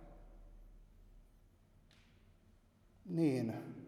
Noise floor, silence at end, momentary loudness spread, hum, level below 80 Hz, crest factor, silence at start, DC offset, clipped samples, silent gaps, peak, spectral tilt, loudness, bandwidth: -68 dBFS; 0 s; 27 LU; none; -62 dBFS; 22 dB; 0 s; under 0.1%; under 0.1%; none; -22 dBFS; -8 dB/octave; -38 LUFS; 14 kHz